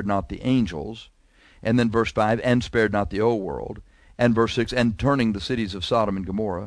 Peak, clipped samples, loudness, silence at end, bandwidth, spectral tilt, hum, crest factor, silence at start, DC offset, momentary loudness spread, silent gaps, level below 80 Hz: -6 dBFS; under 0.1%; -23 LUFS; 0 s; 11 kHz; -6.5 dB/octave; none; 18 dB; 0 s; under 0.1%; 11 LU; none; -42 dBFS